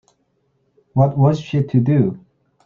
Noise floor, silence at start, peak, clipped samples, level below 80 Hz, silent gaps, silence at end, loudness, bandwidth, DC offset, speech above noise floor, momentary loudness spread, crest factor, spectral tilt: -65 dBFS; 0.95 s; -2 dBFS; under 0.1%; -54 dBFS; none; 0.45 s; -17 LUFS; 7 kHz; under 0.1%; 50 dB; 8 LU; 16 dB; -9.5 dB/octave